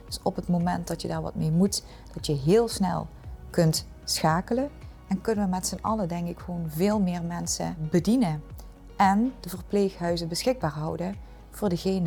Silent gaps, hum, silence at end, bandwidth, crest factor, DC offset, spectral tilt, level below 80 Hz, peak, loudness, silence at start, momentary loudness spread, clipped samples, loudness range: none; none; 0 s; 19.5 kHz; 16 dB; under 0.1%; -5.5 dB/octave; -46 dBFS; -10 dBFS; -27 LUFS; 0 s; 12 LU; under 0.1%; 2 LU